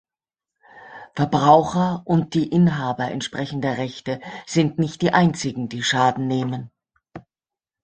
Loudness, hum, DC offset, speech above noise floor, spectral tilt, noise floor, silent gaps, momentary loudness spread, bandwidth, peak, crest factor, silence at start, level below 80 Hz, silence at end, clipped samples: -21 LUFS; none; under 0.1%; over 70 dB; -6 dB/octave; under -90 dBFS; none; 14 LU; 9.2 kHz; -2 dBFS; 20 dB; 0.75 s; -56 dBFS; 0.65 s; under 0.1%